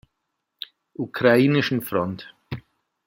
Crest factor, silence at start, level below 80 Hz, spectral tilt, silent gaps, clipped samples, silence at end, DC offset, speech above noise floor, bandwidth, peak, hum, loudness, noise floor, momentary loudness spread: 22 dB; 1 s; -62 dBFS; -6.5 dB/octave; none; under 0.1%; 0.5 s; under 0.1%; 58 dB; 16.5 kHz; -2 dBFS; none; -21 LUFS; -79 dBFS; 21 LU